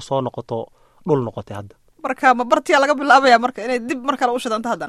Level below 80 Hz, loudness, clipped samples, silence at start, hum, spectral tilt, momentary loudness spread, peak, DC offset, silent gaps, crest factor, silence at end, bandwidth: -58 dBFS; -17 LUFS; under 0.1%; 0 s; none; -4.5 dB/octave; 18 LU; 0 dBFS; under 0.1%; none; 18 dB; 0 s; 14 kHz